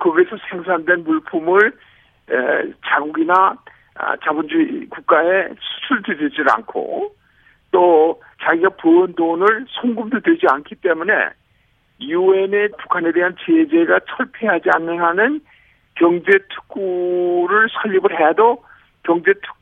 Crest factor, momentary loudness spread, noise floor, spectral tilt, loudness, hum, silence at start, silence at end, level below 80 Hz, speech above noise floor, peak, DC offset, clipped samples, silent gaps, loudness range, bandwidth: 16 dB; 10 LU; -59 dBFS; -7 dB/octave; -17 LUFS; none; 0 s; 0.1 s; -64 dBFS; 43 dB; 0 dBFS; under 0.1%; under 0.1%; none; 2 LU; 3.9 kHz